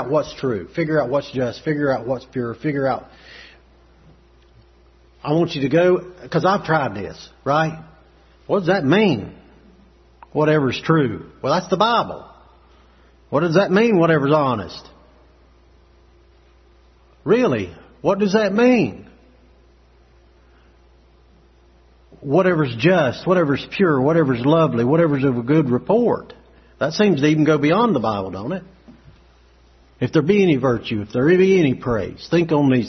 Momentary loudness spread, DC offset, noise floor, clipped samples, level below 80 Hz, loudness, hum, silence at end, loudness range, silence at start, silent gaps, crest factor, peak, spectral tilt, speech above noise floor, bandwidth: 11 LU; under 0.1%; -52 dBFS; under 0.1%; -52 dBFS; -19 LUFS; none; 0 s; 7 LU; 0 s; none; 18 dB; -2 dBFS; -7 dB/octave; 34 dB; 6.4 kHz